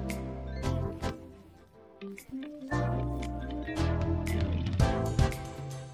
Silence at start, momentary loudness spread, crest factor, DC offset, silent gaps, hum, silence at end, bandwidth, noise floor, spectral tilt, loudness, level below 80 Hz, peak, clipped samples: 0 s; 13 LU; 18 dB; under 0.1%; none; none; 0 s; 15 kHz; -55 dBFS; -6.5 dB/octave; -33 LUFS; -38 dBFS; -14 dBFS; under 0.1%